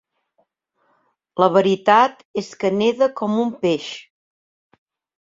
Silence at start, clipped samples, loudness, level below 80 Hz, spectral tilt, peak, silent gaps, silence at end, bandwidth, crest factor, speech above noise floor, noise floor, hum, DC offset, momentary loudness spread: 1.35 s; under 0.1%; -18 LUFS; -66 dBFS; -5.5 dB/octave; -2 dBFS; 2.25-2.34 s; 1.2 s; 7.8 kHz; 20 dB; 49 dB; -67 dBFS; none; under 0.1%; 14 LU